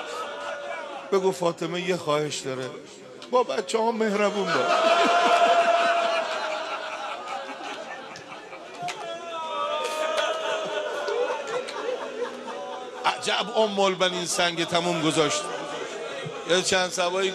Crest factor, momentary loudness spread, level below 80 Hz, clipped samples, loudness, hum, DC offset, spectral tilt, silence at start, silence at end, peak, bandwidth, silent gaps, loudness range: 18 dB; 14 LU; -72 dBFS; under 0.1%; -25 LUFS; none; under 0.1%; -3 dB/octave; 0 s; 0 s; -8 dBFS; 13 kHz; none; 8 LU